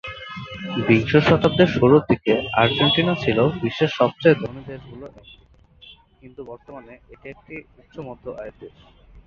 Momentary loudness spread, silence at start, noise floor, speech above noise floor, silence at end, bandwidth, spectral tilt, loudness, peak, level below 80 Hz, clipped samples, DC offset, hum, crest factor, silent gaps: 24 LU; 0.05 s; -49 dBFS; 29 dB; 0.05 s; 7.2 kHz; -7.5 dB/octave; -18 LUFS; -2 dBFS; -48 dBFS; under 0.1%; under 0.1%; none; 20 dB; none